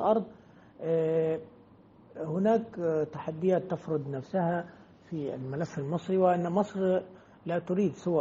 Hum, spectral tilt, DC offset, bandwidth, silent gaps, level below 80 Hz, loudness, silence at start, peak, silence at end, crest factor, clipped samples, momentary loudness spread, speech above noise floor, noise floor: none; -7.5 dB/octave; under 0.1%; 7.6 kHz; none; -70 dBFS; -30 LUFS; 0 s; -12 dBFS; 0 s; 18 dB; under 0.1%; 12 LU; 27 dB; -57 dBFS